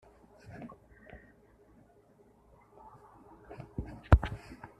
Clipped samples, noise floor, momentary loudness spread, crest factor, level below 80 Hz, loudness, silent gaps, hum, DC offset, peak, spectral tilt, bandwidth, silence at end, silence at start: under 0.1%; -63 dBFS; 30 LU; 32 dB; -40 dBFS; -32 LUFS; none; none; under 0.1%; -4 dBFS; -8.5 dB/octave; 5.6 kHz; 0.25 s; 0.55 s